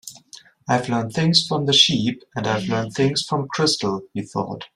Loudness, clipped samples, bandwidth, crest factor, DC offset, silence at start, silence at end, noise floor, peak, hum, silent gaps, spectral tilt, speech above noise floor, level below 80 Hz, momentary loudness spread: -20 LUFS; under 0.1%; 15 kHz; 20 dB; under 0.1%; 0.05 s; 0.1 s; -47 dBFS; -2 dBFS; none; none; -4 dB/octave; 26 dB; -58 dBFS; 13 LU